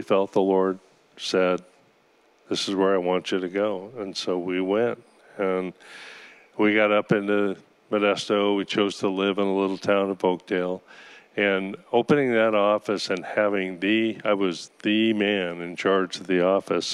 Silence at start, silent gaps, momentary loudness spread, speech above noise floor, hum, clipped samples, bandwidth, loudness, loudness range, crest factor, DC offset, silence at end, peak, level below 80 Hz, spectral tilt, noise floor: 0 s; none; 10 LU; 37 dB; none; under 0.1%; 12 kHz; -24 LUFS; 3 LU; 18 dB; under 0.1%; 0 s; -6 dBFS; -80 dBFS; -5 dB/octave; -61 dBFS